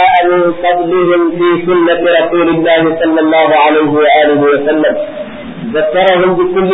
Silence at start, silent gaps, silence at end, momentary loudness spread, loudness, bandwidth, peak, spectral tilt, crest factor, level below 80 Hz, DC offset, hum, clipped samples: 0 s; none; 0 s; 7 LU; -9 LUFS; 4 kHz; 0 dBFS; -8.5 dB/octave; 10 dB; -46 dBFS; under 0.1%; none; under 0.1%